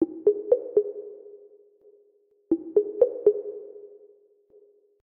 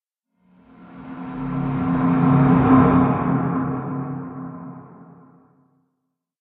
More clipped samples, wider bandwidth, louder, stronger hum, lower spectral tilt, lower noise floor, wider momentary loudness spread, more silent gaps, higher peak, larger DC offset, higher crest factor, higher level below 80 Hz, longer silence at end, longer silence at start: neither; second, 1.8 kHz vs 3.9 kHz; second, -25 LUFS vs -19 LUFS; neither; second, -10.5 dB/octave vs -12.5 dB/octave; second, -64 dBFS vs -77 dBFS; about the same, 22 LU vs 21 LU; neither; second, -6 dBFS vs -2 dBFS; neither; about the same, 20 dB vs 18 dB; second, -70 dBFS vs -44 dBFS; second, 1.1 s vs 1.55 s; second, 0 s vs 0.8 s